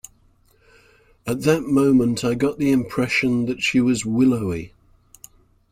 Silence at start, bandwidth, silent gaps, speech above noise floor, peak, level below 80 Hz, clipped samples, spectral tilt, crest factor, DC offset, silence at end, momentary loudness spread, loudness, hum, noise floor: 1.25 s; 15.5 kHz; none; 38 dB; -2 dBFS; -50 dBFS; under 0.1%; -5.5 dB/octave; 18 dB; under 0.1%; 1.05 s; 11 LU; -20 LUFS; none; -58 dBFS